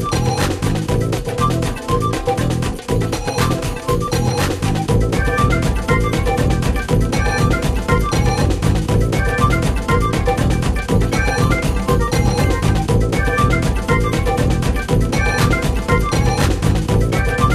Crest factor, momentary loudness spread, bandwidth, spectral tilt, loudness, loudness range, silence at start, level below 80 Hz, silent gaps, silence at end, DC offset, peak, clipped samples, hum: 16 dB; 3 LU; 14 kHz; -6 dB/octave; -17 LUFS; 2 LU; 0 s; -22 dBFS; none; 0 s; 0.2%; 0 dBFS; under 0.1%; none